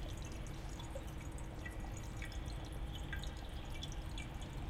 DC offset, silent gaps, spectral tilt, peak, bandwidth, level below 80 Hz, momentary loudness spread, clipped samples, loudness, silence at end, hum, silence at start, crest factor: under 0.1%; none; -5 dB/octave; -30 dBFS; 16 kHz; -46 dBFS; 3 LU; under 0.1%; -47 LUFS; 0 s; none; 0 s; 14 dB